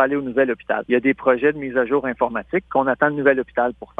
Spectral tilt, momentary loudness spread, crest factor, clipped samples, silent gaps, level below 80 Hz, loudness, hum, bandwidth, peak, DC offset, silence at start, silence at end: -8.5 dB/octave; 5 LU; 18 dB; under 0.1%; none; -54 dBFS; -20 LUFS; none; 3.8 kHz; -2 dBFS; under 0.1%; 0 s; 0.15 s